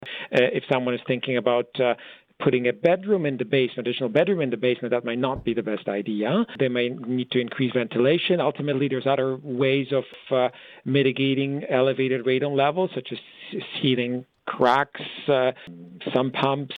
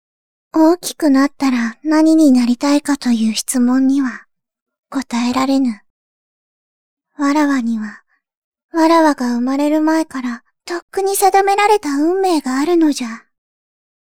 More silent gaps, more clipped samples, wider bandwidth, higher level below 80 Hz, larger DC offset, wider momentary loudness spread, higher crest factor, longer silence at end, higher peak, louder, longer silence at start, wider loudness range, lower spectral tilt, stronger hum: second, none vs 4.61-4.66 s, 4.79-4.83 s, 5.90-6.97 s, 8.37-8.52 s, 8.63-8.69 s, 10.82-10.88 s; neither; second, 6.6 kHz vs 17 kHz; about the same, -62 dBFS vs -58 dBFS; second, under 0.1% vs 0.7%; second, 7 LU vs 13 LU; about the same, 18 dB vs 16 dB; second, 0 s vs 0.9 s; second, -6 dBFS vs 0 dBFS; second, -24 LUFS vs -15 LUFS; second, 0 s vs 0.55 s; second, 2 LU vs 6 LU; first, -8 dB/octave vs -3.5 dB/octave; neither